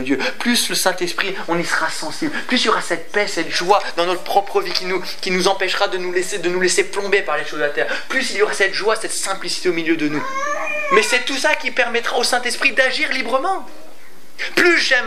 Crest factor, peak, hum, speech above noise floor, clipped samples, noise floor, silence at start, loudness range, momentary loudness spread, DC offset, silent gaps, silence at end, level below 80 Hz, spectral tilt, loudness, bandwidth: 20 dB; 0 dBFS; none; 27 dB; under 0.1%; -46 dBFS; 0 s; 2 LU; 6 LU; 5%; none; 0 s; -70 dBFS; -2 dB/octave; -18 LUFS; 16 kHz